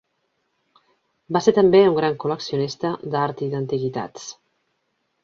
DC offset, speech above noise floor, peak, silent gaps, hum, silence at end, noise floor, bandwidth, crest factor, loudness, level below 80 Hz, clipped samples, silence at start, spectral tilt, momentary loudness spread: under 0.1%; 52 dB; -4 dBFS; none; none; 0.9 s; -72 dBFS; 7.4 kHz; 20 dB; -21 LUFS; -64 dBFS; under 0.1%; 1.3 s; -6 dB/octave; 15 LU